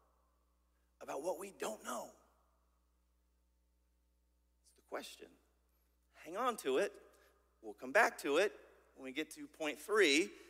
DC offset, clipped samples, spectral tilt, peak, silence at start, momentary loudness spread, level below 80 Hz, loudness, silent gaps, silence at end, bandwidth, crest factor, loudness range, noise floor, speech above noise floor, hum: under 0.1%; under 0.1%; -2 dB/octave; -18 dBFS; 1 s; 22 LU; -78 dBFS; -37 LUFS; none; 0.05 s; 16 kHz; 24 dB; 19 LU; -77 dBFS; 39 dB; none